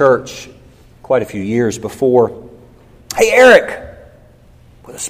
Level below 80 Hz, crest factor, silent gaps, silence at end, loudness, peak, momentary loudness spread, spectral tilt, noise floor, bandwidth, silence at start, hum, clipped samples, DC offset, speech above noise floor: -46 dBFS; 14 dB; none; 0 s; -12 LUFS; 0 dBFS; 23 LU; -4 dB/octave; -44 dBFS; 16 kHz; 0 s; none; 0.3%; under 0.1%; 32 dB